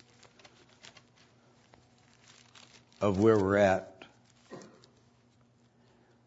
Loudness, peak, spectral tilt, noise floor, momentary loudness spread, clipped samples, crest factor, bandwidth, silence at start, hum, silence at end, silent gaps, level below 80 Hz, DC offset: -27 LUFS; -12 dBFS; -7 dB/octave; -65 dBFS; 29 LU; under 0.1%; 22 dB; 8 kHz; 3 s; none; 1.7 s; none; -70 dBFS; under 0.1%